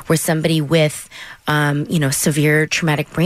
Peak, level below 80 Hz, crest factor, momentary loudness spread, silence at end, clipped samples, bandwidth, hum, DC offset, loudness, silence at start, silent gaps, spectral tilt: -4 dBFS; -48 dBFS; 12 dB; 7 LU; 0 s; under 0.1%; 16 kHz; none; under 0.1%; -17 LUFS; 0 s; none; -4.5 dB/octave